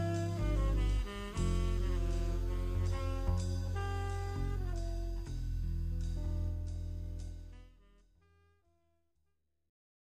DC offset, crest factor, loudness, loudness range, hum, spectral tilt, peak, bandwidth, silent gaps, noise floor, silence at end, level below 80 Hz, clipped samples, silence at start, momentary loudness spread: under 0.1%; 14 dB; -38 LUFS; 9 LU; none; -6.5 dB/octave; -22 dBFS; 10 kHz; none; -82 dBFS; 2.35 s; -38 dBFS; under 0.1%; 0 s; 8 LU